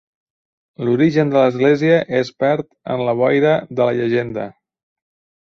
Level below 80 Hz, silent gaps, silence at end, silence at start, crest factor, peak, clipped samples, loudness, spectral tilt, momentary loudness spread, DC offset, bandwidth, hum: -58 dBFS; none; 0.9 s; 0.8 s; 16 dB; -2 dBFS; under 0.1%; -17 LUFS; -7.5 dB/octave; 11 LU; under 0.1%; 7 kHz; none